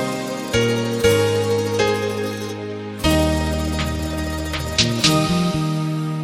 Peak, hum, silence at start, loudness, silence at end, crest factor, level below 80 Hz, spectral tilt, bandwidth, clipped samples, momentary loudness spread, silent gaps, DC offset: -4 dBFS; none; 0 s; -20 LUFS; 0 s; 16 dB; -32 dBFS; -4.5 dB/octave; 16.5 kHz; under 0.1%; 9 LU; none; under 0.1%